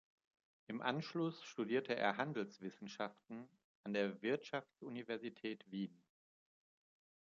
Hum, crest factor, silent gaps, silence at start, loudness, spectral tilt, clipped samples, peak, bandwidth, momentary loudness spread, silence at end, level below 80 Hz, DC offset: none; 24 dB; 3.64-3.84 s; 0.7 s; -43 LUFS; -4 dB/octave; under 0.1%; -20 dBFS; 7.4 kHz; 12 LU; 1.35 s; -90 dBFS; under 0.1%